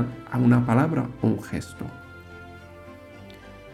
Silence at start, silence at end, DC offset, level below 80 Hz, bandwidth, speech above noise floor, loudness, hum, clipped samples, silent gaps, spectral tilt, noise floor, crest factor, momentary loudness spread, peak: 0 s; 0 s; under 0.1%; -52 dBFS; 13 kHz; 22 dB; -23 LUFS; none; under 0.1%; none; -8.5 dB/octave; -44 dBFS; 18 dB; 24 LU; -8 dBFS